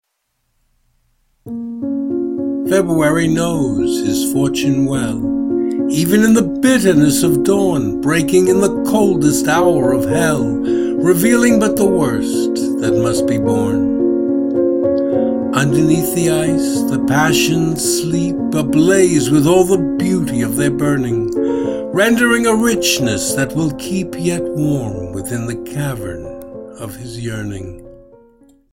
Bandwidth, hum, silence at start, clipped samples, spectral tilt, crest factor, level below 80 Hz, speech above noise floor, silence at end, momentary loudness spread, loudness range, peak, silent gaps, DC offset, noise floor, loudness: 16.5 kHz; none; 1.45 s; under 0.1%; -5 dB/octave; 14 dB; -42 dBFS; 55 dB; 0.75 s; 11 LU; 7 LU; 0 dBFS; none; under 0.1%; -69 dBFS; -15 LUFS